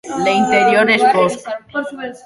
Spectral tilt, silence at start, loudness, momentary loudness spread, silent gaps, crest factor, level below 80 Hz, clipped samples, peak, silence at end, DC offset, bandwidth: -4.5 dB/octave; 0.05 s; -14 LUFS; 13 LU; none; 14 dB; -56 dBFS; under 0.1%; -2 dBFS; 0.1 s; under 0.1%; 11.5 kHz